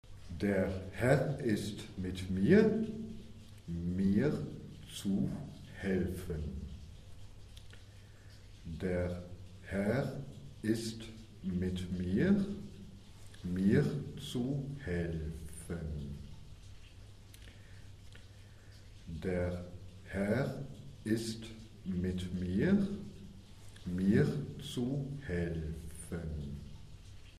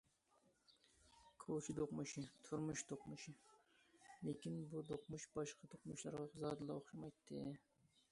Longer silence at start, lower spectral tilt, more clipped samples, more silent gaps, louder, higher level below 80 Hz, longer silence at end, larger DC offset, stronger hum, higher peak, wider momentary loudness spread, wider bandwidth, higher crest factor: second, 0.05 s vs 0.7 s; first, -7 dB/octave vs -5.5 dB/octave; neither; neither; first, -36 LUFS vs -50 LUFS; first, -52 dBFS vs -78 dBFS; second, 0 s vs 0.5 s; neither; neither; first, -14 dBFS vs -34 dBFS; first, 24 LU vs 12 LU; first, 14 kHz vs 11.5 kHz; about the same, 22 dB vs 18 dB